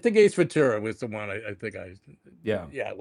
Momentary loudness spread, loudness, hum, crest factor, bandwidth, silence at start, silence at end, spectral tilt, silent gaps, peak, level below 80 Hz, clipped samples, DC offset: 16 LU; -26 LUFS; none; 18 dB; 11 kHz; 0.05 s; 0 s; -6 dB/octave; none; -8 dBFS; -66 dBFS; under 0.1%; under 0.1%